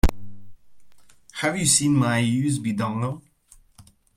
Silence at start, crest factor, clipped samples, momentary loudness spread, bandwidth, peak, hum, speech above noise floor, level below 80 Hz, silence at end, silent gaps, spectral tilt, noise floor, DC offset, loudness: 0.05 s; 20 dB; under 0.1%; 12 LU; 16.5 kHz; -4 dBFS; none; 33 dB; -34 dBFS; 0.35 s; none; -4 dB/octave; -55 dBFS; under 0.1%; -22 LUFS